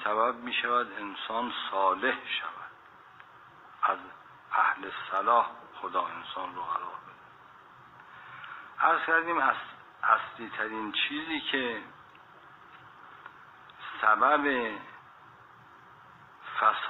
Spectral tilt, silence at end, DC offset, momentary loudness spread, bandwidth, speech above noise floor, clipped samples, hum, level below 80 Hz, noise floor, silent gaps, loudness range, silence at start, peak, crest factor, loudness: -5 dB/octave; 0 s; under 0.1%; 23 LU; 6.4 kHz; 25 dB; under 0.1%; none; -74 dBFS; -54 dBFS; none; 5 LU; 0 s; -8 dBFS; 24 dB; -29 LUFS